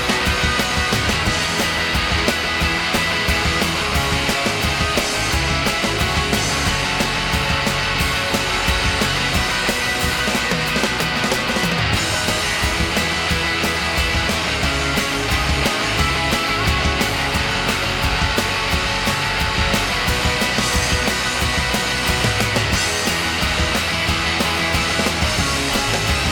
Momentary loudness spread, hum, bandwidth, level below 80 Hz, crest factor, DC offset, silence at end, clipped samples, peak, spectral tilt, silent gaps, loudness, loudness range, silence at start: 1 LU; none; 19.5 kHz; -28 dBFS; 16 dB; under 0.1%; 0 s; under 0.1%; -2 dBFS; -3 dB/octave; none; -18 LUFS; 0 LU; 0 s